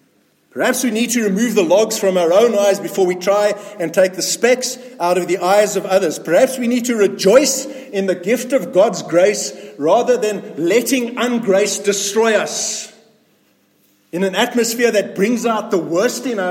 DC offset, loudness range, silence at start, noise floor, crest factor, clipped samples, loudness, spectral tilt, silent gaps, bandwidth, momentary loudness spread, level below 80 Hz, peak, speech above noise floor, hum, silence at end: under 0.1%; 4 LU; 0.55 s; -58 dBFS; 16 dB; under 0.1%; -16 LUFS; -3.5 dB/octave; none; 16.5 kHz; 8 LU; -68 dBFS; 0 dBFS; 42 dB; none; 0 s